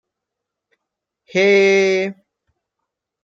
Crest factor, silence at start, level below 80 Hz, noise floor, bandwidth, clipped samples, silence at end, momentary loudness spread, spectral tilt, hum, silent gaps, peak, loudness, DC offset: 16 dB; 1.35 s; -74 dBFS; -82 dBFS; 7.4 kHz; under 0.1%; 1.1 s; 11 LU; -4.5 dB/octave; none; none; -4 dBFS; -15 LUFS; under 0.1%